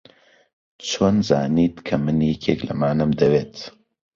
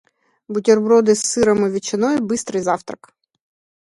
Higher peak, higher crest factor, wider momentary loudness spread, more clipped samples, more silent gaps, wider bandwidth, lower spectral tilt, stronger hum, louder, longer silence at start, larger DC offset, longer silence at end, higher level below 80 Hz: about the same, -2 dBFS vs -2 dBFS; about the same, 20 dB vs 18 dB; first, 14 LU vs 11 LU; neither; neither; second, 7.6 kHz vs 11.5 kHz; first, -6.5 dB/octave vs -4.5 dB/octave; neither; second, -20 LUFS vs -17 LUFS; first, 0.8 s vs 0.5 s; neither; second, 0.45 s vs 0.85 s; first, -48 dBFS vs -56 dBFS